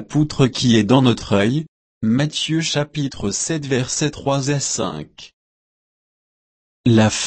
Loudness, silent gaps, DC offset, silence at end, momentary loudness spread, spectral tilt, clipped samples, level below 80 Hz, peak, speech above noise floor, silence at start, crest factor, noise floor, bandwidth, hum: -19 LUFS; 1.68-2.01 s, 5.33-6.84 s; under 0.1%; 0 s; 10 LU; -5 dB/octave; under 0.1%; -46 dBFS; -2 dBFS; over 72 dB; 0 s; 18 dB; under -90 dBFS; 8.8 kHz; none